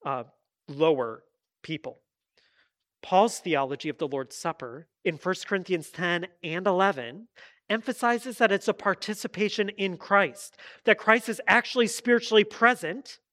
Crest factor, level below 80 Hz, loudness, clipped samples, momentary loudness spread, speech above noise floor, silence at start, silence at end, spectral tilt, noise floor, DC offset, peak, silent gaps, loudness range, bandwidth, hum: 24 dB; -78 dBFS; -26 LUFS; under 0.1%; 14 LU; 44 dB; 0.05 s; 0.2 s; -4 dB/octave; -70 dBFS; under 0.1%; -2 dBFS; none; 6 LU; 15.5 kHz; none